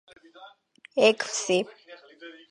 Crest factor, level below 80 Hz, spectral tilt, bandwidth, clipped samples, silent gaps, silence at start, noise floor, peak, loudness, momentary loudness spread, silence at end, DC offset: 24 dB; -80 dBFS; -2.5 dB/octave; 11 kHz; under 0.1%; none; 0.4 s; -55 dBFS; -6 dBFS; -24 LUFS; 24 LU; 0.2 s; under 0.1%